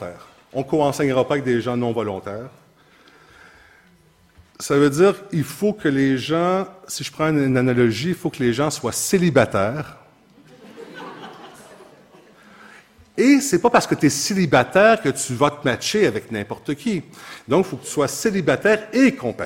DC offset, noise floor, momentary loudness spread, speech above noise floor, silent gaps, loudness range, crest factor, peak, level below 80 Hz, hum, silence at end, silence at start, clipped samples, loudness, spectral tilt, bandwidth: under 0.1%; -55 dBFS; 17 LU; 36 dB; none; 8 LU; 20 dB; 0 dBFS; -56 dBFS; none; 0 s; 0 s; under 0.1%; -19 LUFS; -5 dB/octave; 16.5 kHz